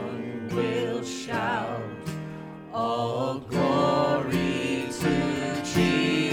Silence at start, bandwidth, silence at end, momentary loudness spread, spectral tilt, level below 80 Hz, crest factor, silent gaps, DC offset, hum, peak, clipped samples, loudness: 0 s; 19 kHz; 0 s; 12 LU; -5.5 dB/octave; -52 dBFS; 16 dB; none; under 0.1%; none; -10 dBFS; under 0.1%; -27 LUFS